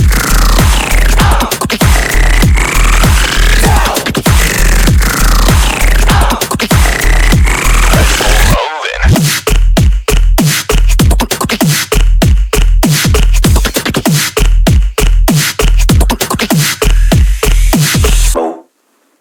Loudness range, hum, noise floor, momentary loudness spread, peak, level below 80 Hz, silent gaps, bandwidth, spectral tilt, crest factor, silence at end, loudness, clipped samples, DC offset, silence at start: 1 LU; none; -55 dBFS; 3 LU; 0 dBFS; -10 dBFS; none; 18 kHz; -4 dB/octave; 8 dB; 0.6 s; -10 LUFS; under 0.1%; under 0.1%; 0 s